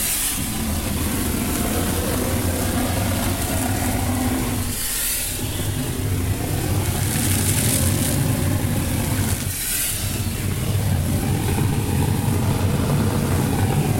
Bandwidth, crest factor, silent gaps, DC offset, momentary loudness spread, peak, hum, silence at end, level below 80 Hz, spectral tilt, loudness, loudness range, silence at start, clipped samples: 16.5 kHz; 18 dB; none; under 0.1%; 4 LU; -4 dBFS; none; 0 s; -32 dBFS; -4.5 dB/octave; -21 LUFS; 2 LU; 0 s; under 0.1%